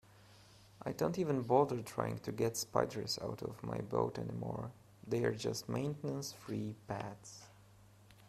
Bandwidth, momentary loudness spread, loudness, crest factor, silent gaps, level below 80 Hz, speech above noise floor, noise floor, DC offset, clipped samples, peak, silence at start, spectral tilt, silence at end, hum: 15 kHz; 13 LU; -38 LUFS; 24 dB; none; -68 dBFS; 24 dB; -62 dBFS; under 0.1%; under 0.1%; -14 dBFS; 0.15 s; -5.5 dB/octave; 0 s; none